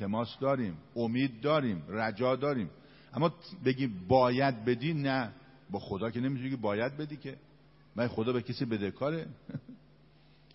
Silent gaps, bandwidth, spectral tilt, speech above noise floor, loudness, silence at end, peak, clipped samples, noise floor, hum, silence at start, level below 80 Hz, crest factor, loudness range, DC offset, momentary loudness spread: none; 5.8 kHz; -10.5 dB/octave; 30 dB; -32 LUFS; 0.8 s; -12 dBFS; under 0.1%; -61 dBFS; none; 0 s; -64 dBFS; 20 dB; 5 LU; under 0.1%; 13 LU